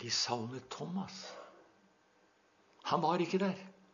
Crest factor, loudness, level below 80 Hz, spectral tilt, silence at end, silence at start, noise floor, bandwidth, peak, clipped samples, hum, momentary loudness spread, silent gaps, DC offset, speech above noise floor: 20 dB; -36 LUFS; -84 dBFS; -3.5 dB/octave; 0.2 s; 0 s; -70 dBFS; 7.2 kHz; -18 dBFS; under 0.1%; none; 16 LU; none; under 0.1%; 34 dB